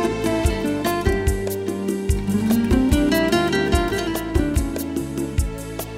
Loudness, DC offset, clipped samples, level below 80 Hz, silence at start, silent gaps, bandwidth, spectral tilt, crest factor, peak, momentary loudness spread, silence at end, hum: -21 LUFS; under 0.1%; under 0.1%; -28 dBFS; 0 s; none; 16 kHz; -5.5 dB/octave; 16 dB; -4 dBFS; 8 LU; 0 s; none